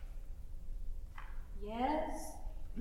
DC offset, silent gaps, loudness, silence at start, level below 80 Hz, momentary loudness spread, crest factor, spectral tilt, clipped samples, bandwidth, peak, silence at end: under 0.1%; none; -44 LUFS; 0 s; -44 dBFS; 16 LU; 18 dB; -5.5 dB/octave; under 0.1%; 13.5 kHz; -24 dBFS; 0 s